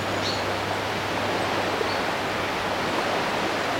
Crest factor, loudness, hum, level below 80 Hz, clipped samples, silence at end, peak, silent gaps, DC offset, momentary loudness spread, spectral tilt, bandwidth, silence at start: 14 dB; -25 LUFS; none; -52 dBFS; under 0.1%; 0 s; -12 dBFS; none; under 0.1%; 2 LU; -4 dB/octave; 16.5 kHz; 0 s